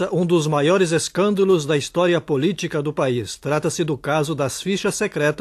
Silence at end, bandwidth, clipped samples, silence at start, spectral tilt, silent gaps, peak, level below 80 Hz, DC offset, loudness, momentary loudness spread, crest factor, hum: 0 s; 13 kHz; under 0.1%; 0 s; -5 dB/octave; none; -6 dBFS; -56 dBFS; under 0.1%; -20 LUFS; 6 LU; 14 dB; none